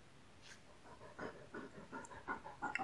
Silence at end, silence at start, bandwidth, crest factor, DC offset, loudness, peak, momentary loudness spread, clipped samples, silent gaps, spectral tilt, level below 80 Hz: 0 s; 0 s; 11.5 kHz; 26 dB; under 0.1%; -51 LUFS; -24 dBFS; 14 LU; under 0.1%; none; -4 dB/octave; -74 dBFS